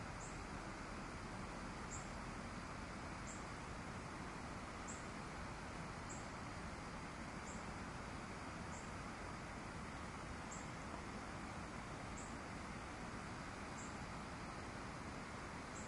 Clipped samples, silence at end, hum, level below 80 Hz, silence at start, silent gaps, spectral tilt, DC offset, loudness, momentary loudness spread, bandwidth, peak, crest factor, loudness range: under 0.1%; 0 s; none; -60 dBFS; 0 s; none; -4.5 dB/octave; under 0.1%; -50 LUFS; 1 LU; 11.5 kHz; -36 dBFS; 14 dB; 0 LU